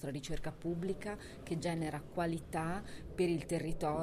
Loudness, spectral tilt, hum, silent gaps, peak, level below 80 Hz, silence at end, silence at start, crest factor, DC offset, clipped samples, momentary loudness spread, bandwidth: -39 LUFS; -6 dB/octave; none; none; -22 dBFS; -52 dBFS; 0 s; 0 s; 16 dB; under 0.1%; under 0.1%; 8 LU; 15.5 kHz